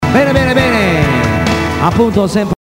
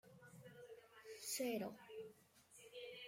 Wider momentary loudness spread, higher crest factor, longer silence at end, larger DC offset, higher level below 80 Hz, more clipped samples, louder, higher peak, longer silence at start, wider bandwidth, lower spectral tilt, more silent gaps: second, 3 LU vs 20 LU; second, 12 dB vs 20 dB; first, 0.2 s vs 0 s; first, 0.3% vs under 0.1%; first, -28 dBFS vs under -90 dBFS; neither; first, -12 LUFS vs -49 LUFS; first, 0 dBFS vs -32 dBFS; about the same, 0 s vs 0.05 s; about the same, 16.5 kHz vs 16.5 kHz; first, -6 dB/octave vs -3 dB/octave; neither